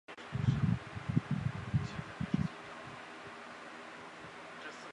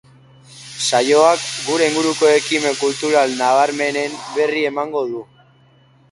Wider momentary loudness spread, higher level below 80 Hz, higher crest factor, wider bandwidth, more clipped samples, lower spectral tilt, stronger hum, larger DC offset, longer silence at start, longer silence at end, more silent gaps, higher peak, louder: first, 14 LU vs 10 LU; first, -54 dBFS vs -66 dBFS; about the same, 22 dB vs 18 dB; about the same, 11 kHz vs 11.5 kHz; neither; first, -7 dB/octave vs -2.5 dB/octave; neither; neither; second, 0.1 s vs 0.5 s; second, 0 s vs 0.9 s; neither; second, -16 dBFS vs 0 dBFS; second, -39 LUFS vs -17 LUFS